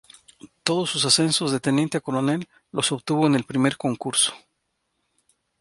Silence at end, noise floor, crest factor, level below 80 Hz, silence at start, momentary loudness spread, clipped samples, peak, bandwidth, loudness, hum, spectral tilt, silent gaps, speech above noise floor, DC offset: 1.25 s; -75 dBFS; 24 dB; -66 dBFS; 0.45 s; 7 LU; under 0.1%; 0 dBFS; 11.5 kHz; -22 LUFS; none; -3.5 dB/octave; none; 52 dB; under 0.1%